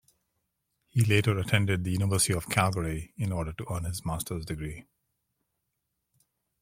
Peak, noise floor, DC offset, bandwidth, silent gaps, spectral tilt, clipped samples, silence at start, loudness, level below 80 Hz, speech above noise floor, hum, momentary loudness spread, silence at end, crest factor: -6 dBFS; -81 dBFS; under 0.1%; 16.5 kHz; none; -4.5 dB/octave; under 0.1%; 0.95 s; -29 LUFS; -50 dBFS; 53 dB; none; 10 LU; 1.8 s; 24 dB